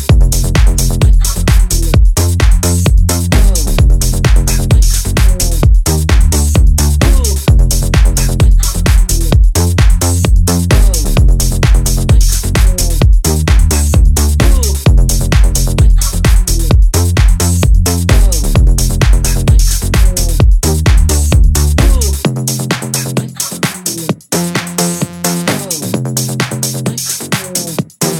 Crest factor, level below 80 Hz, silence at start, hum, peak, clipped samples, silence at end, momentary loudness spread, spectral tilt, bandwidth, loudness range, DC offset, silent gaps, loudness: 8 dB; -10 dBFS; 0 s; none; 0 dBFS; 0.2%; 0 s; 5 LU; -4.5 dB/octave; 17 kHz; 4 LU; under 0.1%; none; -11 LUFS